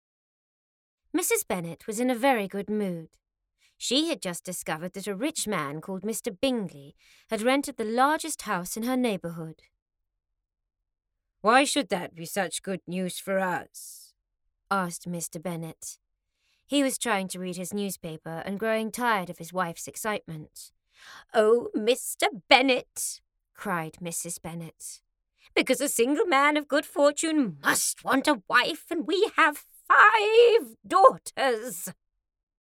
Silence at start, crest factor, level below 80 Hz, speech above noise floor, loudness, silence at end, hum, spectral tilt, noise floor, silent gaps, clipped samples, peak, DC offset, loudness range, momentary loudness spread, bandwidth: 1.15 s; 24 dB; -68 dBFS; 48 dB; -26 LUFS; 0.7 s; none; -3 dB/octave; -74 dBFS; 9.82-9.86 s; under 0.1%; -4 dBFS; under 0.1%; 10 LU; 16 LU; 18.5 kHz